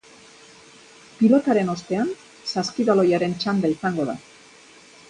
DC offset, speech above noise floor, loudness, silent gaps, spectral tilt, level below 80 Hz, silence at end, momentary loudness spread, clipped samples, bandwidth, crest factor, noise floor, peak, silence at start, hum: under 0.1%; 28 dB; -22 LUFS; none; -6 dB/octave; -64 dBFS; 0.9 s; 10 LU; under 0.1%; 10.5 kHz; 18 dB; -49 dBFS; -4 dBFS; 1.2 s; none